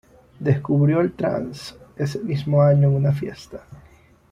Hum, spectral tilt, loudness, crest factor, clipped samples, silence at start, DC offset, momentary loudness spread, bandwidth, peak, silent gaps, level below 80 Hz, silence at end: none; -8.5 dB/octave; -20 LUFS; 16 dB; under 0.1%; 0.4 s; under 0.1%; 20 LU; 9.2 kHz; -6 dBFS; none; -52 dBFS; 0.55 s